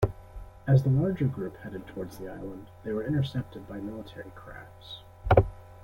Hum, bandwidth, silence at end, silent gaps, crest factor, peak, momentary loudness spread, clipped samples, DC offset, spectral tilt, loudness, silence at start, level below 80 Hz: none; 12 kHz; 0.05 s; none; 26 dB; -4 dBFS; 20 LU; under 0.1%; under 0.1%; -9 dB/octave; -29 LUFS; 0 s; -44 dBFS